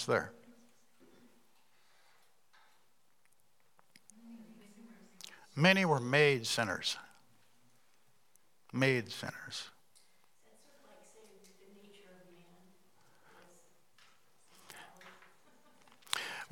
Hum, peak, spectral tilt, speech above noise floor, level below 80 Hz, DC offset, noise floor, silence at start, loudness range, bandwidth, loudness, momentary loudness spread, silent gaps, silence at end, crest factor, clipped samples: none; -10 dBFS; -4.5 dB/octave; 43 dB; -84 dBFS; under 0.1%; -75 dBFS; 0 s; 18 LU; 17.5 kHz; -32 LUFS; 29 LU; none; 0.05 s; 30 dB; under 0.1%